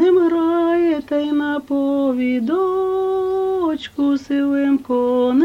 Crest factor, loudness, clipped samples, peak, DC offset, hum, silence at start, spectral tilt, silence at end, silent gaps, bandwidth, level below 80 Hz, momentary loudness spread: 12 dB; -18 LUFS; under 0.1%; -6 dBFS; under 0.1%; none; 0 s; -6.5 dB/octave; 0 s; none; 7.4 kHz; -54 dBFS; 4 LU